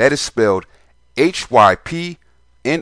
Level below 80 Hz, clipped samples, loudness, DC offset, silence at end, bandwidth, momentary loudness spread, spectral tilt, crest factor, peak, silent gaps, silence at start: -48 dBFS; under 0.1%; -16 LUFS; 0.2%; 0 s; 10.5 kHz; 14 LU; -4.5 dB/octave; 16 dB; 0 dBFS; none; 0 s